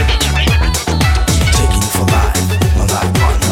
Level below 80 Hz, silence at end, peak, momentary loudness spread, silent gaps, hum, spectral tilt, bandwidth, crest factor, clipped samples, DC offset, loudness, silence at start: -16 dBFS; 0 s; 0 dBFS; 2 LU; none; none; -4 dB/octave; 17 kHz; 12 dB; under 0.1%; under 0.1%; -13 LUFS; 0 s